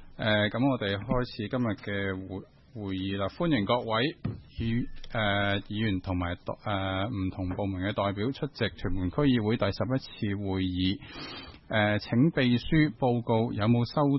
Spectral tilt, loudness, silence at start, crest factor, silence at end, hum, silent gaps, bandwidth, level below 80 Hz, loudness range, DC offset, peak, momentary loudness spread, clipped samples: -9 dB/octave; -29 LUFS; 0 s; 16 dB; 0 s; none; none; 6 kHz; -48 dBFS; 4 LU; under 0.1%; -12 dBFS; 10 LU; under 0.1%